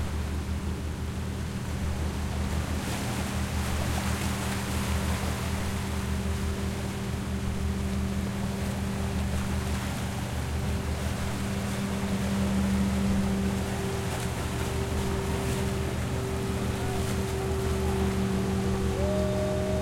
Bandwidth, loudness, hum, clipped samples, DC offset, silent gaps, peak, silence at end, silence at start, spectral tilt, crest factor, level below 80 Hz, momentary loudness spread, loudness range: 16.5 kHz; -30 LUFS; none; under 0.1%; under 0.1%; none; -14 dBFS; 0 s; 0 s; -5.5 dB/octave; 14 dB; -38 dBFS; 5 LU; 2 LU